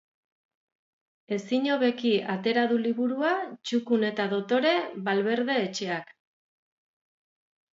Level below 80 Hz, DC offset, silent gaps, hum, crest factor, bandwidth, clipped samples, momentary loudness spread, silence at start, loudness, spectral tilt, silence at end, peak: -80 dBFS; under 0.1%; none; none; 18 dB; 7.8 kHz; under 0.1%; 6 LU; 1.3 s; -27 LUFS; -5 dB/octave; 1.7 s; -10 dBFS